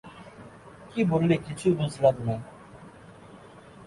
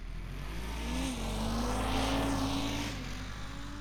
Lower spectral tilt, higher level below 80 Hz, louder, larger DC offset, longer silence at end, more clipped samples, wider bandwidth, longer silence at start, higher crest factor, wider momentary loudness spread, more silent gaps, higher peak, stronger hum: first, -7.5 dB/octave vs -4.5 dB/octave; second, -56 dBFS vs -40 dBFS; first, -26 LUFS vs -35 LUFS; neither; about the same, 0 s vs 0 s; neither; second, 11.5 kHz vs 19 kHz; about the same, 0.05 s vs 0 s; about the same, 20 dB vs 16 dB; first, 25 LU vs 11 LU; neither; first, -8 dBFS vs -20 dBFS; neither